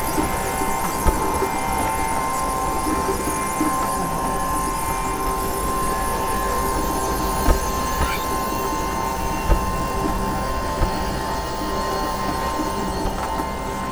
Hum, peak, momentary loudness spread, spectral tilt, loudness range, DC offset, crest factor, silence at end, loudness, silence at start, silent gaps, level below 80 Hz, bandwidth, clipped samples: none; -2 dBFS; 3 LU; -4 dB/octave; 2 LU; under 0.1%; 20 dB; 0 s; -23 LUFS; 0 s; none; -28 dBFS; over 20 kHz; under 0.1%